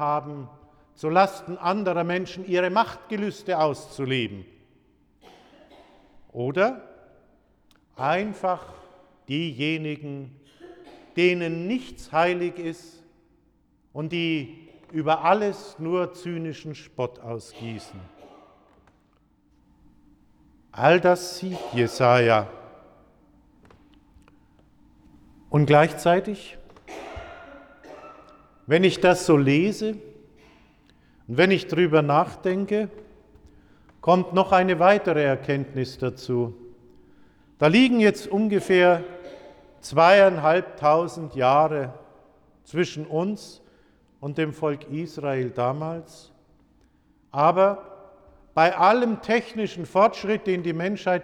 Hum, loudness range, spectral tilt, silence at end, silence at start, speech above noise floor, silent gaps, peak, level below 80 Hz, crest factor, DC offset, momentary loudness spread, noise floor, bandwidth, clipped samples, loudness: none; 9 LU; -6 dB/octave; 0 s; 0 s; 41 dB; none; -6 dBFS; -60 dBFS; 20 dB; under 0.1%; 19 LU; -63 dBFS; 14 kHz; under 0.1%; -23 LUFS